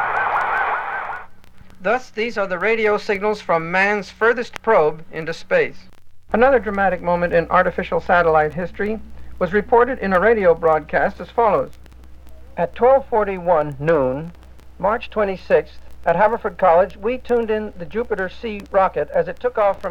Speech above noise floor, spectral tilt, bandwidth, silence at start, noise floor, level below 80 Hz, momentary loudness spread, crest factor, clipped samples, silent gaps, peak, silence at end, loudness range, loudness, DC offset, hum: 20 dB; -6.5 dB/octave; 8.6 kHz; 0 s; -38 dBFS; -42 dBFS; 10 LU; 18 dB; under 0.1%; none; 0 dBFS; 0 s; 3 LU; -19 LUFS; under 0.1%; none